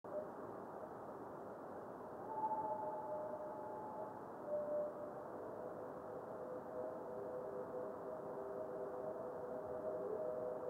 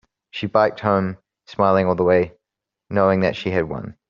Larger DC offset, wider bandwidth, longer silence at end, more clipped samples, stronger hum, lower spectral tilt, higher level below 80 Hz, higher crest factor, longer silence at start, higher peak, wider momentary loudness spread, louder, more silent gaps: neither; first, 16.5 kHz vs 7 kHz; second, 0 s vs 0.15 s; neither; neither; first, -8 dB/octave vs -5.5 dB/octave; second, -82 dBFS vs -54 dBFS; about the same, 16 dB vs 18 dB; second, 0.05 s vs 0.35 s; second, -30 dBFS vs -2 dBFS; second, 8 LU vs 12 LU; second, -47 LUFS vs -20 LUFS; neither